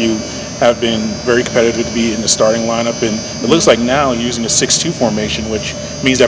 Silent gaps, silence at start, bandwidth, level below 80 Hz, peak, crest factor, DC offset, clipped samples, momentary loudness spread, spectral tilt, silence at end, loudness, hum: none; 0 s; 8 kHz; -36 dBFS; 0 dBFS; 14 dB; under 0.1%; 0.3%; 7 LU; -3.5 dB/octave; 0 s; -14 LUFS; none